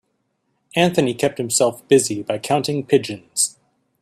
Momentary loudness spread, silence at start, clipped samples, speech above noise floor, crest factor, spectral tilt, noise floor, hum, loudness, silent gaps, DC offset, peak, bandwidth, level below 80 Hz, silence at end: 6 LU; 0.75 s; under 0.1%; 51 dB; 18 dB; -4 dB/octave; -70 dBFS; none; -19 LUFS; none; under 0.1%; -2 dBFS; 14.5 kHz; -60 dBFS; 0.55 s